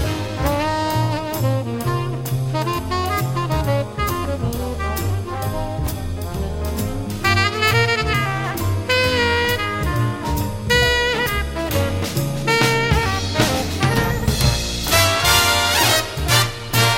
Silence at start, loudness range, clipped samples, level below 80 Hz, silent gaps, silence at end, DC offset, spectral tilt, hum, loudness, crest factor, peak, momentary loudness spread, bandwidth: 0 s; 6 LU; under 0.1%; -30 dBFS; none; 0 s; under 0.1%; -4 dB/octave; none; -19 LUFS; 18 dB; 0 dBFS; 9 LU; 16.5 kHz